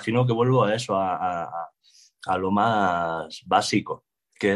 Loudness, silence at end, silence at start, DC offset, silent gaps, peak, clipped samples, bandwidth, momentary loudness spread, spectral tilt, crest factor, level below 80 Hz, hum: -24 LUFS; 0 s; 0 s; under 0.1%; none; -6 dBFS; under 0.1%; 12 kHz; 15 LU; -5.5 dB/octave; 18 dB; -64 dBFS; none